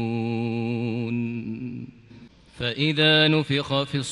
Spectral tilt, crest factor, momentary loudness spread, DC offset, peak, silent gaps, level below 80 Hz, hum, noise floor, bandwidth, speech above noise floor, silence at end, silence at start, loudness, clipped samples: -5.5 dB/octave; 16 dB; 16 LU; under 0.1%; -8 dBFS; none; -58 dBFS; none; -48 dBFS; 11 kHz; 27 dB; 0 s; 0 s; -23 LUFS; under 0.1%